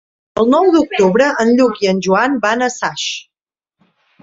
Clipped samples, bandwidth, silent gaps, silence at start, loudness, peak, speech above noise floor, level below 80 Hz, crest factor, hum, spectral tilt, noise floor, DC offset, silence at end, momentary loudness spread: under 0.1%; 7.8 kHz; none; 0.35 s; -14 LUFS; -2 dBFS; 67 dB; -54 dBFS; 14 dB; none; -4.5 dB/octave; -80 dBFS; under 0.1%; 1 s; 9 LU